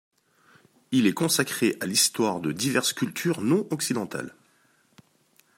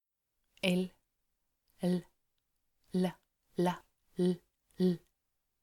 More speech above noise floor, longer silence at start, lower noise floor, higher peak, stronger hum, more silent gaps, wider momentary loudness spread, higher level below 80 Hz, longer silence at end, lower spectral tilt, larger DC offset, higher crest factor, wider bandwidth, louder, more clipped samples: second, 39 dB vs 52 dB; first, 0.9 s vs 0.65 s; second, -64 dBFS vs -84 dBFS; first, -8 dBFS vs -16 dBFS; neither; neither; second, 7 LU vs 10 LU; about the same, -70 dBFS vs -72 dBFS; first, 1.3 s vs 0.65 s; second, -3.5 dB/octave vs -7 dB/octave; neither; about the same, 20 dB vs 22 dB; about the same, 16 kHz vs 15 kHz; first, -25 LUFS vs -35 LUFS; neither